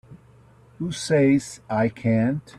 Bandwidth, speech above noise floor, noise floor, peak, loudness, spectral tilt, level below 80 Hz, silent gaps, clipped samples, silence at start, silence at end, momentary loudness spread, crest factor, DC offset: 12.5 kHz; 30 dB; -52 dBFS; -8 dBFS; -23 LUFS; -6.5 dB/octave; -56 dBFS; none; under 0.1%; 0.1 s; 0.2 s; 11 LU; 14 dB; under 0.1%